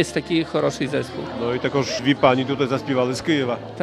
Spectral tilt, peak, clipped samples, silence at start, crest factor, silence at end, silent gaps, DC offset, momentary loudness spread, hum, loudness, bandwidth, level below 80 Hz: -5.5 dB/octave; -2 dBFS; under 0.1%; 0 s; 20 dB; 0 s; none; under 0.1%; 8 LU; none; -22 LUFS; 13.5 kHz; -52 dBFS